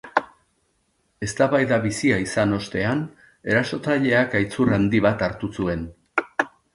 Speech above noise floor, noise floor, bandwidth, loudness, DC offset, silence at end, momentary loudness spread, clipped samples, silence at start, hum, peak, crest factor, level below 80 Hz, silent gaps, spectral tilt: 47 dB; -68 dBFS; 11.5 kHz; -22 LUFS; under 0.1%; 0.25 s; 8 LU; under 0.1%; 0.05 s; none; -2 dBFS; 20 dB; -48 dBFS; none; -6 dB/octave